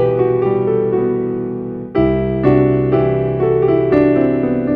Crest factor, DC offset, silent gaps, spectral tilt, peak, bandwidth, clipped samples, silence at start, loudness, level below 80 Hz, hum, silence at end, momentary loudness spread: 14 dB; under 0.1%; none; -11.5 dB/octave; 0 dBFS; 4.7 kHz; under 0.1%; 0 s; -15 LUFS; -36 dBFS; none; 0 s; 8 LU